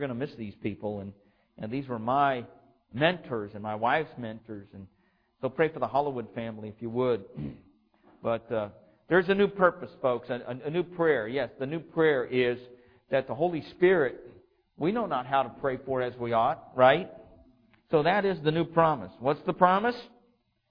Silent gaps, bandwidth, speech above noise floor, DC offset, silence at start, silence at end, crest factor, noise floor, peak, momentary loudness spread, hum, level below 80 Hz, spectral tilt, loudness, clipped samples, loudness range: none; 5.2 kHz; 41 dB; under 0.1%; 0 s; 0.65 s; 22 dB; -69 dBFS; -6 dBFS; 15 LU; none; -62 dBFS; -9 dB/octave; -28 LUFS; under 0.1%; 5 LU